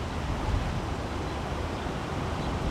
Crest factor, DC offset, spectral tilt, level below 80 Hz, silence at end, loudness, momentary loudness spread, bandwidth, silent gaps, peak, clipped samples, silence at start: 14 dB; under 0.1%; -6 dB/octave; -36 dBFS; 0 s; -32 LUFS; 3 LU; 14 kHz; none; -16 dBFS; under 0.1%; 0 s